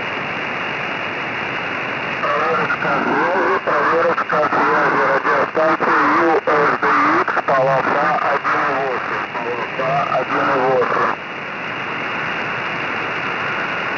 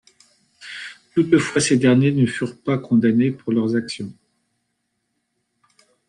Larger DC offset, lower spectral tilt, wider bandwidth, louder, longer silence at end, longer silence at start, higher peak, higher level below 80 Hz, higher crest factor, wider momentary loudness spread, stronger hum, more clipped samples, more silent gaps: neither; about the same, -5.5 dB/octave vs -5.5 dB/octave; second, 6 kHz vs 11 kHz; about the same, -17 LUFS vs -19 LUFS; second, 0 s vs 1.95 s; second, 0 s vs 0.6 s; second, -8 dBFS vs -4 dBFS; about the same, -60 dBFS vs -62 dBFS; second, 10 dB vs 18 dB; second, 7 LU vs 18 LU; neither; neither; neither